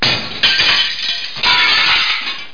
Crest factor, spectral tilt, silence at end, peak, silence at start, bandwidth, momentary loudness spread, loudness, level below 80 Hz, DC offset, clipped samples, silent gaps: 14 dB; -1.5 dB/octave; 0.05 s; 0 dBFS; 0 s; 5.4 kHz; 8 LU; -12 LUFS; -44 dBFS; 3%; under 0.1%; none